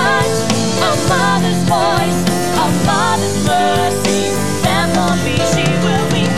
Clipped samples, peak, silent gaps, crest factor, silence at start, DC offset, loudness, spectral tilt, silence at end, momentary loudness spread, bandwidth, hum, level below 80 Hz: under 0.1%; 0 dBFS; none; 12 dB; 0 s; 4%; -14 LUFS; -4.5 dB/octave; 0 s; 2 LU; 16 kHz; none; -38 dBFS